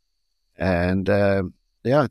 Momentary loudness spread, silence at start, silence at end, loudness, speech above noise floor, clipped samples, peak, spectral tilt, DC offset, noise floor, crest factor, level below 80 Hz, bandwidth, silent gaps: 10 LU; 0.6 s; 0 s; -22 LUFS; 55 dB; under 0.1%; -6 dBFS; -8.5 dB/octave; under 0.1%; -75 dBFS; 16 dB; -46 dBFS; 12.5 kHz; none